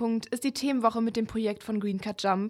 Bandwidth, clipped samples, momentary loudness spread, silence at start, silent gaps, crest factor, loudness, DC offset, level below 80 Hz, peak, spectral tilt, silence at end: 14.5 kHz; under 0.1%; 5 LU; 0 s; none; 18 dB; -29 LUFS; under 0.1%; -62 dBFS; -10 dBFS; -5.5 dB/octave; 0 s